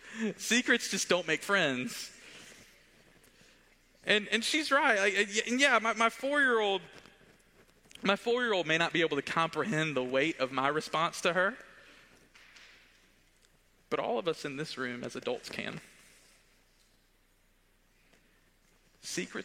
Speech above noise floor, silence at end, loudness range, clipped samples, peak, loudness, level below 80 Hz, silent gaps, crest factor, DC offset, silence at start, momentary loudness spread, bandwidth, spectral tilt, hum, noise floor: 37 dB; 0 s; 13 LU; under 0.1%; -10 dBFS; -30 LUFS; -70 dBFS; none; 24 dB; under 0.1%; 0.05 s; 12 LU; 16 kHz; -3 dB/octave; none; -68 dBFS